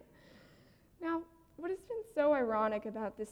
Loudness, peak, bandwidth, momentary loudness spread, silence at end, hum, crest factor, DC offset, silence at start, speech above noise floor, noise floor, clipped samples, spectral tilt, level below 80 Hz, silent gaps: -36 LUFS; -20 dBFS; 13 kHz; 12 LU; 0 s; none; 16 dB; under 0.1%; 0.35 s; 31 dB; -64 dBFS; under 0.1%; -6.5 dB/octave; -68 dBFS; none